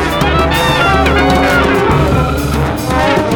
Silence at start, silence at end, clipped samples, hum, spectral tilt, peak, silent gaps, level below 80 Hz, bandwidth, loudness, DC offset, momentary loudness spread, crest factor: 0 s; 0 s; under 0.1%; none; -5.5 dB/octave; 0 dBFS; none; -20 dBFS; 20 kHz; -11 LUFS; under 0.1%; 4 LU; 10 dB